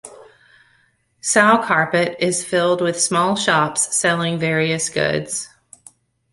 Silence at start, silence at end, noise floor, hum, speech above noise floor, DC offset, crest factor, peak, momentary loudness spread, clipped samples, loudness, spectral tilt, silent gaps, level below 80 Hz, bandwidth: 0.05 s; 0.85 s; -61 dBFS; none; 43 dB; under 0.1%; 18 dB; -2 dBFS; 8 LU; under 0.1%; -18 LUFS; -3 dB/octave; none; -60 dBFS; 11.5 kHz